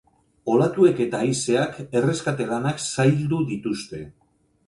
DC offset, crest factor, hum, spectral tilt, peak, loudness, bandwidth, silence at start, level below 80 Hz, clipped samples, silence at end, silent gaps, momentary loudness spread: under 0.1%; 18 dB; none; -6 dB/octave; -4 dBFS; -22 LUFS; 11.5 kHz; 0.45 s; -58 dBFS; under 0.1%; 0.55 s; none; 11 LU